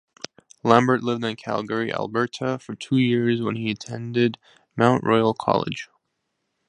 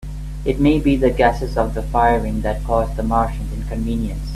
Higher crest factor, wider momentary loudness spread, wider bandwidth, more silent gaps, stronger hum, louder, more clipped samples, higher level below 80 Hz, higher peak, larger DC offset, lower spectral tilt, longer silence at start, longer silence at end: first, 22 dB vs 16 dB; first, 17 LU vs 9 LU; second, 10.5 kHz vs 13.5 kHz; neither; second, none vs 50 Hz at -25 dBFS; second, -23 LUFS vs -19 LUFS; neither; second, -62 dBFS vs -26 dBFS; about the same, 0 dBFS vs -2 dBFS; neither; about the same, -6.5 dB/octave vs -7.5 dB/octave; first, 0.65 s vs 0 s; first, 0.85 s vs 0 s